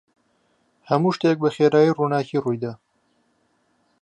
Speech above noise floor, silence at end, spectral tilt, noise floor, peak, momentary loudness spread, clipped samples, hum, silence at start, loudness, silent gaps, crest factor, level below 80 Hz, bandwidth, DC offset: 47 dB; 1.25 s; -7.5 dB/octave; -66 dBFS; -4 dBFS; 10 LU; under 0.1%; none; 0.9 s; -21 LUFS; none; 18 dB; -70 dBFS; 8.8 kHz; under 0.1%